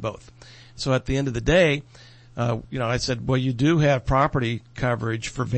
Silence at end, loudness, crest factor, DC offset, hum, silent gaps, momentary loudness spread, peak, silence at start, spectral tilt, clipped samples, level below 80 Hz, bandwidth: 0 s; -23 LUFS; 16 dB; under 0.1%; none; none; 10 LU; -6 dBFS; 0 s; -6 dB/octave; under 0.1%; -40 dBFS; 8.8 kHz